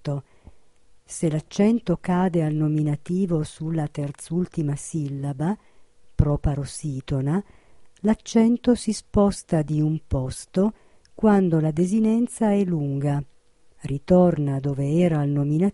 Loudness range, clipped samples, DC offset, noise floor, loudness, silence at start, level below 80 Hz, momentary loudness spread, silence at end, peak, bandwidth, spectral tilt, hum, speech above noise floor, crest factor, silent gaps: 5 LU; under 0.1%; under 0.1%; -53 dBFS; -23 LUFS; 0.05 s; -40 dBFS; 10 LU; 0 s; -2 dBFS; 11.5 kHz; -7.5 dB/octave; none; 31 dB; 20 dB; none